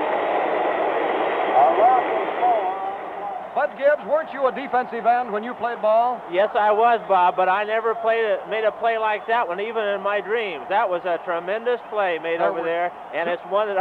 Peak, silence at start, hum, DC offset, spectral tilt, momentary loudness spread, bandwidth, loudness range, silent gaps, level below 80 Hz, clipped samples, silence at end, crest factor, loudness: -6 dBFS; 0 s; none; under 0.1%; -6 dB/octave; 8 LU; 4.8 kHz; 3 LU; none; -68 dBFS; under 0.1%; 0 s; 14 dB; -22 LUFS